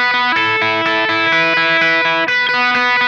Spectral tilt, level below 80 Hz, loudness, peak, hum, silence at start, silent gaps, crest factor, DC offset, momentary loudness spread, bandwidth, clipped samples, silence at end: -3.5 dB/octave; -72 dBFS; -12 LUFS; -4 dBFS; none; 0 s; none; 10 dB; under 0.1%; 2 LU; 11 kHz; under 0.1%; 0 s